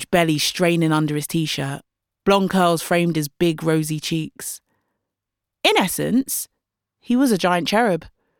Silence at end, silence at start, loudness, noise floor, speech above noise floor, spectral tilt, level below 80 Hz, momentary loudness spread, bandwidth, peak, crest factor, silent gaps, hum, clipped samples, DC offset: 0.3 s; 0 s; -20 LUFS; -84 dBFS; 64 dB; -4.5 dB/octave; -56 dBFS; 10 LU; 19 kHz; -2 dBFS; 18 dB; none; none; under 0.1%; under 0.1%